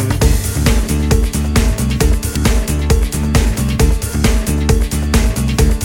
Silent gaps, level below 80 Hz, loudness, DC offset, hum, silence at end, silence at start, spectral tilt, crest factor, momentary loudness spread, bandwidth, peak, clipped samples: none; -16 dBFS; -15 LUFS; under 0.1%; none; 0 s; 0 s; -5 dB/octave; 14 dB; 1 LU; 17.5 kHz; 0 dBFS; under 0.1%